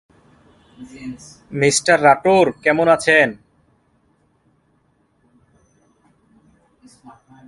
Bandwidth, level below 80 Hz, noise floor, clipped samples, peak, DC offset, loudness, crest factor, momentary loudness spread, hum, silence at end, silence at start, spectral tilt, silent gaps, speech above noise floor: 11.5 kHz; -58 dBFS; -62 dBFS; under 0.1%; 0 dBFS; under 0.1%; -15 LUFS; 20 dB; 21 LU; none; 4.15 s; 0.8 s; -3.5 dB/octave; none; 46 dB